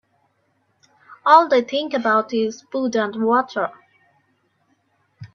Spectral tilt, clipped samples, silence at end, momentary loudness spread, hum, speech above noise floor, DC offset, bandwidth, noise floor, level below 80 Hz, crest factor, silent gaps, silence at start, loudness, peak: -4.5 dB/octave; under 0.1%; 0.1 s; 12 LU; none; 48 dB; under 0.1%; 7 kHz; -66 dBFS; -70 dBFS; 22 dB; none; 1.1 s; -19 LUFS; 0 dBFS